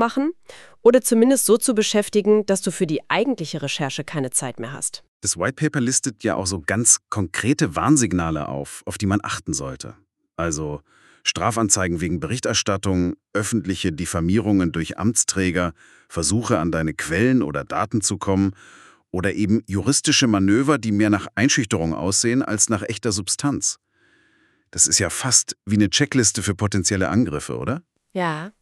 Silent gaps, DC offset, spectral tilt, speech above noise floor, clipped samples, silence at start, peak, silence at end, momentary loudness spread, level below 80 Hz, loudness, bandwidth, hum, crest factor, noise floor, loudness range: 5.08-5.20 s; under 0.1%; -4 dB/octave; 40 dB; under 0.1%; 0 s; -2 dBFS; 0.1 s; 10 LU; -48 dBFS; -20 LUFS; 13.5 kHz; none; 18 dB; -61 dBFS; 5 LU